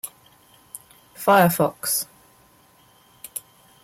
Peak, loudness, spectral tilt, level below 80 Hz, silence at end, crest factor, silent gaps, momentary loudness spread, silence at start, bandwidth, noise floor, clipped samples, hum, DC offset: -6 dBFS; -20 LUFS; -4 dB/octave; -64 dBFS; 0.45 s; 20 dB; none; 25 LU; 0.05 s; 16.5 kHz; -56 dBFS; under 0.1%; none; under 0.1%